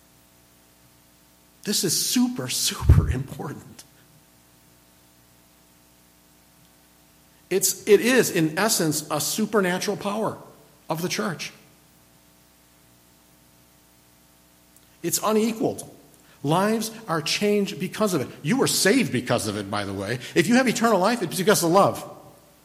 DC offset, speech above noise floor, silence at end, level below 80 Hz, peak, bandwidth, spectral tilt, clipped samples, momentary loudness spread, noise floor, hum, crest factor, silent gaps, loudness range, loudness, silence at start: under 0.1%; 34 dB; 0.35 s; -40 dBFS; -6 dBFS; 16 kHz; -4 dB/octave; under 0.1%; 13 LU; -56 dBFS; 60 Hz at -55 dBFS; 20 dB; none; 12 LU; -22 LUFS; 1.65 s